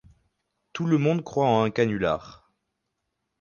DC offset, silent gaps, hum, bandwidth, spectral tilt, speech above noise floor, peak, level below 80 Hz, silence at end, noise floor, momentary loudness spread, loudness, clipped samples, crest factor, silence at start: under 0.1%; none; none; 7.2 kHz; -7 dB/octave; 56 dB; -8 dBFS; -58 dBFS; 1.1 s; -80 dBFS; 9 LU; -24 LUFS; under 0.1%; 18 dB; 0.75 s